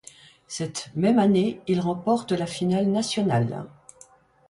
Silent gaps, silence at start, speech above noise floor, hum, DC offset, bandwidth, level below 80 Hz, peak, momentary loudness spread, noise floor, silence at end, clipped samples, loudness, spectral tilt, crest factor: none; 0.5 s; 31 dB; none; under 0.1%; 11.5 kHz; -62 dBFS; -10 dBFS; 12 LU; -54 dBFS; 0.8 s; under 0.1%; -24 LUFS; -6 dB/octave; 16 dB